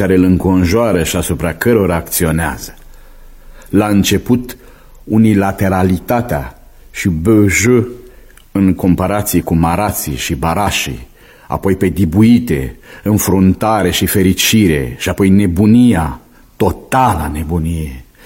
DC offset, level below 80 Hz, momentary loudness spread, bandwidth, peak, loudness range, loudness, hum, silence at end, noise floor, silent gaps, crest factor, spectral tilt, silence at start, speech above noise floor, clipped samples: under 0.1%; -30 dBFS; 11 LU; 16.5 kHz; 0 dBFS; 4 LU; -13 LUFS; none; 0.2 s; -39 dBFS; none; 14 dB; -5.5 dB/octave; 0 s; 27 dB; under 0.1%